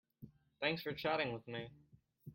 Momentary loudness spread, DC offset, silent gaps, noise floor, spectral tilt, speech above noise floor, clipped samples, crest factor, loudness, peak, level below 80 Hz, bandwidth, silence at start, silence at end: 23 LU; under 0.1%; none; -61 dBFS; -7 dB/octave; 20 dB; under 0.1%; 22 dB; -40 LUFS; -22 dBFS; -74 dBFS; 16.5 kHz; 0.2 s; 0 s